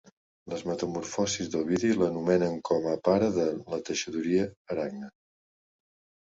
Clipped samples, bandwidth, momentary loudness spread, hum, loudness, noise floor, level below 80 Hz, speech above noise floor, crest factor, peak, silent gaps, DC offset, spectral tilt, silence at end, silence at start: under 0.1%; 8 kHz; 10 LU; none; -29 LUFS; under -90 dBFS; -60 dBFS; over 62 dB; 18 dB; -10 dBFS; 4.57-4.65 s; under 0.1%; -5 dB/octave; 1.1 s; 0.45 s